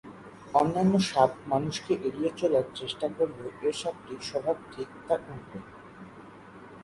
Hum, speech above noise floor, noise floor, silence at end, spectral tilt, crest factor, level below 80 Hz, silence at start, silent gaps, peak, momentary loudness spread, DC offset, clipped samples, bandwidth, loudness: none; 20 dB; -48 dBFS; 0 s; -5.5 dB/octave; 22 dB; -62 dBFS; 0.05 s; none; -8 dBFS; 23 LU; under 0.1%; under 0.1%; 11.5 kHz; -29 LUFS